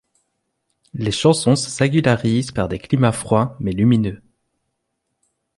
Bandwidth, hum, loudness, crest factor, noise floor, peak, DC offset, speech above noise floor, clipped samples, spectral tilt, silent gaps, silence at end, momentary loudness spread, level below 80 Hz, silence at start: 11.5 kHz; none; -18 LUFS; 18 dB; -75 dBFS; -2 dBFS; under 0.1%; 57 dB; under 0.1%; -6 dB/octave; none; 1.4 s; 8 LU; -46 dBFS; 0.95 s